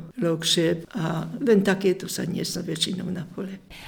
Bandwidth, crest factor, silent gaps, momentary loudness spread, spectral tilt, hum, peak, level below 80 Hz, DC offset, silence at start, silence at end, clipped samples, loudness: over 20 kHz; 18 dB; none; 12 LU; -4.5 dB/octave; none; -8 dBFS; -58 dBFS; under 0.1%; 0 s; 0 s; under 0.1%; -25 LUFS